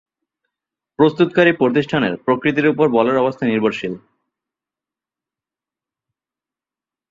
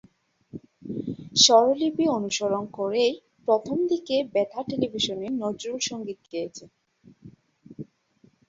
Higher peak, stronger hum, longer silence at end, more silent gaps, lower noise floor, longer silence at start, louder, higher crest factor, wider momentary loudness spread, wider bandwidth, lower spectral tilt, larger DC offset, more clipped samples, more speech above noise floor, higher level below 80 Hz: about the same, -2 dBFS vs -4 dBFS; neither; first, 3.1 s vs 0.65 s; neither; first, -90 dBFS vs -61 dBFS; first, 1 s vs 0.55 s; first, -16 LUFS vs -24 LUFS; about the same, 18 dB vs 22 dB; second, 6 LU vs 25 LU; about the same, 7.4 kHz vs 7.8 kHz; first, -7.5 dB/octave vs -3 dB/octave; neither; neither; first, 73 dB vs 37 dB; first, -60 dBFS vs -66 dBFS